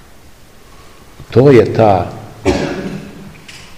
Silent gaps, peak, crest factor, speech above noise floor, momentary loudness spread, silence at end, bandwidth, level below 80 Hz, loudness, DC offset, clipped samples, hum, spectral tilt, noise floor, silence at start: none; 0 dBFS; 14 dB; 32 dB; 25 LU; 0.2 s; 15 kHz; -38 dBFS; -12 LUFS; 0.8%; 0.9%; none; -7.5 dB/octave; -41 dBFS; 1.2 s